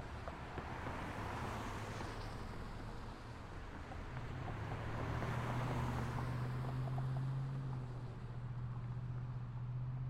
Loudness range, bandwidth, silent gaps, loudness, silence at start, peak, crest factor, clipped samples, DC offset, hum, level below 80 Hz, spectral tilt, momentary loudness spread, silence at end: 6 LU; 13 kHz; none; -44 LUFS; 0 s; -28 dBFS; 16 dB; under 0.1%; under 0.1%; none; -52 dBFS; -7 dB/octave; 9 LU; 0 s